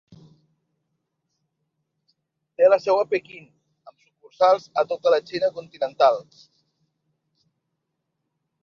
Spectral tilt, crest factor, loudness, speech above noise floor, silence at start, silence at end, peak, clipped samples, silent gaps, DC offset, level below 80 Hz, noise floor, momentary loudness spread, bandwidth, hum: -4.5 dB/octave; 20 dB; -21 LUFS; 57 dB; 2.6 s; 2.4 s; -6 dBFS; under 0.1%; none; under 0.1%; -74 dBFS; -79 dBFS; 12 LU; 7 kHz; none